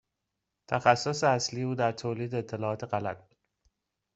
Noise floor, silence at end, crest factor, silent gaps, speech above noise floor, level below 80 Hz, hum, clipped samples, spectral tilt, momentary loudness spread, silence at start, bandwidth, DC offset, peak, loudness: -85 dBFS; 0.95 s; 24 dB; none; 56 dB; -68 dBFS; none; under 0.1%; -5 dB/octave; 9 LU; 0.7 s; 8.2 kHz; under 0.1%; -6 dBFS; -29 LUFS